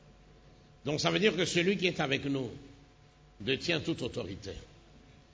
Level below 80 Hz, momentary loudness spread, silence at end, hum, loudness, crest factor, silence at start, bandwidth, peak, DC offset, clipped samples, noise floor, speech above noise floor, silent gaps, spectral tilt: -58 dBFS; 15 LU; 0.2 s; none; -31 LUFS; 22 dB; 0.05 s; 8 kHz; -12 dBFS; under 0.1%; under 0.1%; -59 dBFS; 28 dB; none; -4.5 dB/octave